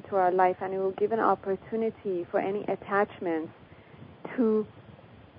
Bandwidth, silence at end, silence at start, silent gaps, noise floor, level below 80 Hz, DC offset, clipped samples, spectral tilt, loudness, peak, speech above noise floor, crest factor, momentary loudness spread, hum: 5.2 kHz; 0.15 s; 0.05 s; none; -51 dBFS; -66 dBFS; under 0.1%; under 0.1%; -10.5 dB/octave; -28 LUFS; -10 dBFS; 23 dB; 18 dB; 9 LU; none